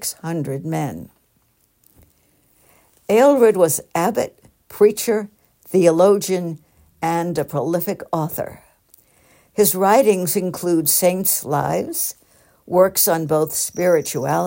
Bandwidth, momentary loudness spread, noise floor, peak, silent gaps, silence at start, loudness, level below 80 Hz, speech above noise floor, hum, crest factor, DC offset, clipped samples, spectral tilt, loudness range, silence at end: 16.5 kHz; 12 LU; -62 dBFS; -2 dBFS; none; 0 s; -18 LUFS; -60 dBFS; 44 dB; none; 18 dB; under 0.1%; under 0.1%; -4.5 dB/octave; 5 LU; 0 s